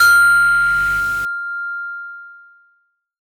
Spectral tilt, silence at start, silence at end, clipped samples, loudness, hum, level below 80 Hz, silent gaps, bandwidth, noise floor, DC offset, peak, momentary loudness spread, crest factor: 0 dB/octave; 0 s; 0.85 s; under 0.1%; -15 LUFS; none; -44 dBFS; none; over 20 kHz; -63 dBFS; under 0.1%; -4 dBFS; 20 LU; 14 dB